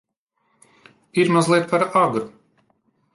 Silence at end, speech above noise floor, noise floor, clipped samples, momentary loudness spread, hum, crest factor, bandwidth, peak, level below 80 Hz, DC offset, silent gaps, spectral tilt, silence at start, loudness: 0.85 s; 52 dB; -70 dBFS; under 0.1%; 10 LU; none; 18 dB; 11.5 kHz; -6 dBFS; -68 dBFS; under 0.1%; none; -5.5 dB/octave; 1.15 s; -19 LUFS